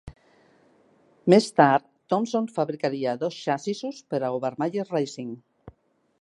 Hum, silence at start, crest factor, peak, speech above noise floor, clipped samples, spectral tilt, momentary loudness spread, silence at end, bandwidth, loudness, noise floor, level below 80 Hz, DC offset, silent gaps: none; 0.05 s; 24 dB; -2 dBFS; 36 dB; under 0.1%; -6 dB/octave; 12 LU; 0.5 s; 11.5 kHz; -25 LUFS; -60 dBFS; -62 dBFS; under 0.1%; none